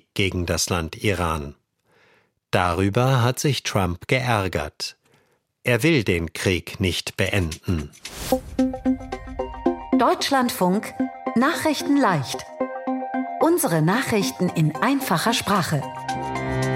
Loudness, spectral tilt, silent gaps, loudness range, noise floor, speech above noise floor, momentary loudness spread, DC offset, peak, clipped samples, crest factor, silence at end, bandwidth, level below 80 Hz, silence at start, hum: -22 LUFS; -5 dB/octave; none; 3 LU; -63 dBFS; 42 dB; 9 LU; under 0.1%; -2 dBFS; under 0.1%; 20 dB; 0 s; 16.5 kHz; -44 dBFS; 0.15 s; none